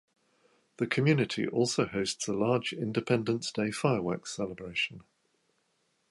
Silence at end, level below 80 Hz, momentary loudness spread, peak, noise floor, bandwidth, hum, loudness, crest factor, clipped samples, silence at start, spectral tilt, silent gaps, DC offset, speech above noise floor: 1.1 s; -66 dBFS; 8 LU; -12 dBFS; -75 dBFS; 11.5 kHz; none; -30 LUFS; 20 dB; under 0.1%; 0.8 s; -5 dB/octave; none; under 0.1%; 45 dB